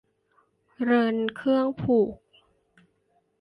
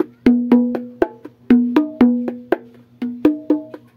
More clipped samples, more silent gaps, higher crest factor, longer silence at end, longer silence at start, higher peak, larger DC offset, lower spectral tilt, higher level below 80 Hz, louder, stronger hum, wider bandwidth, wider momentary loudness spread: neither; neither; about the same, 16 dB vs 18 dB; first, 1.25 s vs 0.2 s; first, 0.8 s vs 0 s; second, -12 dBFS vs 0 dBFS; neither; about the same, -8 dB/octave vs -8 dB/octave; second, -62 dBFS vs -50 dBFS; second, -25 LUFS vs -18 LUFS; neither; about the same, 5.2 kHz vs 5 kHz; second, 6 LU vs 10 LU